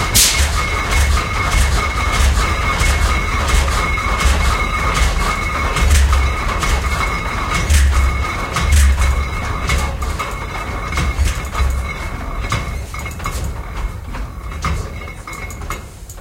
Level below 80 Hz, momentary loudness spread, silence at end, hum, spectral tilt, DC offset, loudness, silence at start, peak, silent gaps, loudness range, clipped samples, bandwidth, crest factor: -18 dBFS; 13 LU; 0 s; none; -3.5 dB/octave; under 0.1%; -17 LUFS; 0 s; 0 dBFS; none; 8 LU; under 0.1%; 16.5 kHz; 16 dB